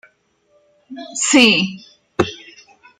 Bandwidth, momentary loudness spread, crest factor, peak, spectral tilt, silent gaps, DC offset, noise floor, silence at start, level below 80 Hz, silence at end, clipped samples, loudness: 14 kHz; 25 LU; 20 dB; 0 dBFS; -2.5 dB/octave; none; under 0.1%; -60 dBFS; 0.9 s; -58 dBFS; 0.65 s; under 0.1%; -15 LUFS